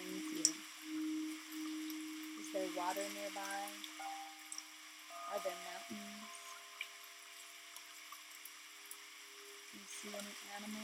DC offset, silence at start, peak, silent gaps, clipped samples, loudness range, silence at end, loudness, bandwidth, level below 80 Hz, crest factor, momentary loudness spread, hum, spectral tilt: under 0.1%; 0 s; -12 dBFS; none; under 0.1%; 10 LU; 0 s; -45 LUFS; 17 kHz; under -90 dBFS; 34 dB; 12 LU; none; -1.5 dB/octave